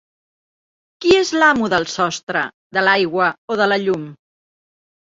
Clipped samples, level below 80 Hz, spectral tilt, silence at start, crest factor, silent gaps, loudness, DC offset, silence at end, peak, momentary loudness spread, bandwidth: under 0.1%; -56 dBFS; -4 dB/octave; 1 s; 18 dB; 2.23-2.27 s, 2.54-2.70 s, 3.38-3.48 s; -17 LUFS; under 0.1%; 0.9 s; -2 dBFS; 8 LU; 7.8 kHz